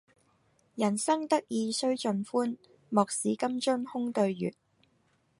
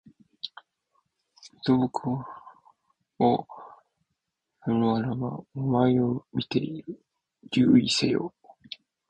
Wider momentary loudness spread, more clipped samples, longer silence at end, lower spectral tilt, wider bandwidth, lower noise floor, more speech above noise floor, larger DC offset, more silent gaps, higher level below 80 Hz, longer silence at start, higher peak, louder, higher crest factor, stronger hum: second, 8 LU vs 22 LU; neither; about the same, 0.9 s vs 0.8 s; second, -4.5 dB/octave vs -6 dB/octave; first, 11.5 kHz vs 9.6 kHz; second, -70 dBFS vs -82 dBFS; second, 41 dB vs 57 dB; neither; neither; second, -78 dBFS vs -62 dBFS; first, 0.75 s vs 0.45 s; about the same, -10 dBFS vs -8 dBFS; second, -30 LUFS vs -26 LUFS; about the same, 22 dB vs 20 dB; neither